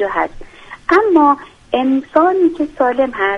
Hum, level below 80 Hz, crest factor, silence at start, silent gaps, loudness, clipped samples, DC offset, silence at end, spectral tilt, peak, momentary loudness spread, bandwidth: none; -44 dBFS; 14 dB; 0 s; none; -14 LUFS; under 0.1%; under 0.1%; 0 s; -5.5 dB/octave; 0 dBFS; 9 LU; 7.2 kHz